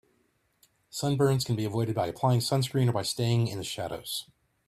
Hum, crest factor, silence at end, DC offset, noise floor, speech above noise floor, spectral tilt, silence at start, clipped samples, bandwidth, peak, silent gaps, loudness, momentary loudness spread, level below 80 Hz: none; 16 dB; 0.45 s; under 0.1%; -71 dBFS; 44 dB; -5.5 dB/octave; 0.95 s; under 0.1%; 15.5 kHz; -12 dBFS; none; -28 LUFS; 9 LU; -62 dBFS